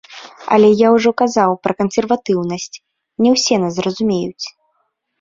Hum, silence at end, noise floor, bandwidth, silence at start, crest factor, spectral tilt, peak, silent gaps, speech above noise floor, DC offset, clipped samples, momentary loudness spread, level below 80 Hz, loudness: none; 0.7 s; -67 dBFS; 7.6 kHz; 0.1 s; 14 dB; -5 dB/octave; -2 dBFS; none; 53 dB; under 0.1%; under 0.1%; 17 LU; -56 dBFS; -15 LUFS